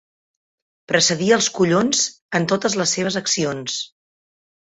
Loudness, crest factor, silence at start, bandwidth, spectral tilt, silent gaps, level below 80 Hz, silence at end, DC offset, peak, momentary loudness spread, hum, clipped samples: -19 LUFS; 18 dB; 0.9 s; 8.4 kHz; -3 dB/octave; 2.22-2.29 s; -60 dBFS; 0.85 s; under 0.1%; -2 dBFS; 9 LU; none; under 0.1%